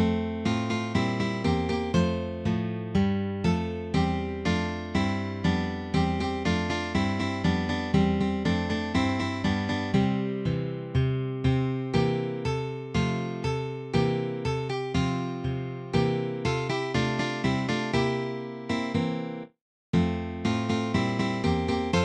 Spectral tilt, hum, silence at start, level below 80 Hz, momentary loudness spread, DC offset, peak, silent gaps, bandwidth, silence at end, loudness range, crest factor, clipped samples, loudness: -6.5 dB/octave; none; 0 s; -44 dBFS; 4 LU; under 0.1%; -10 dBFS; 19.61-19.93 s; 9.8 kHz; 0 s; 2 LU; 16 dB; under 0.1%; -28 LUFS